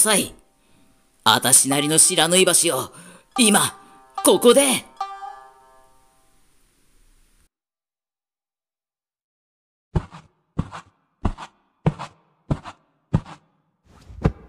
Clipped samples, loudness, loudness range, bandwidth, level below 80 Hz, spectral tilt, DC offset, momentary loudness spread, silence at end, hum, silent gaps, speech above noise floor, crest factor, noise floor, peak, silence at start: under 0.1%; -18 LUFS; 20 LU; 16 kHz; -42 dBFS; -2.5 dB/octave; under 0.1%; 20 LU; 0.15 s; none; 9.24-9.91 s; over 73 dB; 22 dB; under -90 dBFS; 0 dBFS; 0 s